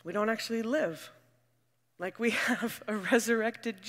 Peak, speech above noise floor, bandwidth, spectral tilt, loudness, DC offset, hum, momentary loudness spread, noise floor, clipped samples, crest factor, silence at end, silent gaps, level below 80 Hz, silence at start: -10 dBFS; 44 dB; 16 kHz; -3.5 dB/octave; -31 LUFS; under 0.1%; none; 13 LU; -75 dBFS; under 0.1%; 22 dB; 0 s; none; -82 dBFS; 0.05 s